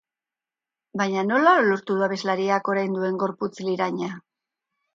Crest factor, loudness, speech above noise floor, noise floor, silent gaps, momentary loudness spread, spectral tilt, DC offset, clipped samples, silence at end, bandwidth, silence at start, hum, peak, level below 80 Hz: 18 dB; -23 LUFS; over 67 dB; under -90 dBFS; none; 12 LU; -6 dB/octave; under 0.1%; under 0.1%; 0.75 s; 7.6 kHz; 0.95 s; none; -6 dBFS; -72 dBFS